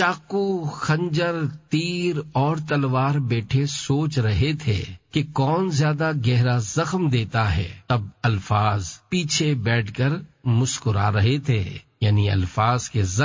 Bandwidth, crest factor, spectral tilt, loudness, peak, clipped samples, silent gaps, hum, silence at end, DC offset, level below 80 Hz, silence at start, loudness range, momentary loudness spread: 7.6 kHz; 16 dB; -5.5 dB/octave; -23 LUFS; -6 dBFS; under 0.1%; none; none; 0 s; under 0.1%; -40 dBFS; 0 s; 1 LU; 5 LU